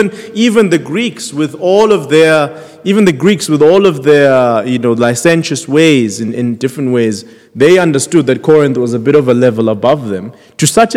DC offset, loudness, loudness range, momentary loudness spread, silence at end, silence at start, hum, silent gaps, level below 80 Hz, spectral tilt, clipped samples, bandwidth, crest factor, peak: under 0.1%; -10 LUFS; 2 LU; 8 LU; 0 s; 0 s; none; none; -52 dBFS; -5 dB/octave; 1%; 16 kHz; 10 dB; 0 dBFS